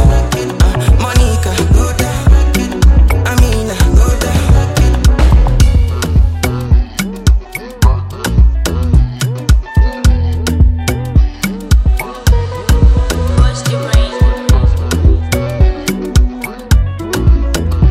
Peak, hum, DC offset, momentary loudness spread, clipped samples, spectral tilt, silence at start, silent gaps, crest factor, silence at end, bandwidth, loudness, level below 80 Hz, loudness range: 0 dBFS; none; under 0.1%; 5 LU; under 0.1%; -5.5 dB/octave; 0 s; none; 10 dB; 0 s; 15 kHz; -12 LUFS; -12 dBFS; 2 LU